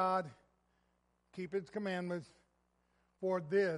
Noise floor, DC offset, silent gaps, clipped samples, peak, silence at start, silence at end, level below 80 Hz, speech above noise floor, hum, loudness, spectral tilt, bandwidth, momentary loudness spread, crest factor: -78 dBFS; under 0.1%; none; under 0.1%; -22 dBFS; 0 s; 0 s; -78 dBFS; 41 dB; none; -39 LUFS; -7 dB/octave; 11.5 kHz; 14 LU; 18 dB